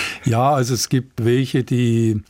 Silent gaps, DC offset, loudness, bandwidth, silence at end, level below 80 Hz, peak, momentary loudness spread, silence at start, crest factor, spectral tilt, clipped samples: none; under 0.1%; -18 LUFS; 16.5 kHz; 0.1 s; -52 dBFS; -6 dBFS; 3 LU; 0 s; 12 dB; -5.5 dB/octave; under 0.1%